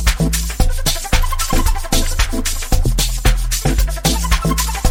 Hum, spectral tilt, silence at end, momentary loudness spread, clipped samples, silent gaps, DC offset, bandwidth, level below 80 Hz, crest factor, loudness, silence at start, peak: none; -3.5 dB/octave; 0 s; 3 LU; under 0.1%; none; under 0.1%; 18.5 kHz; -16 dBFS; 14 dB; -18 LUFS; 0 s; 0 dBFS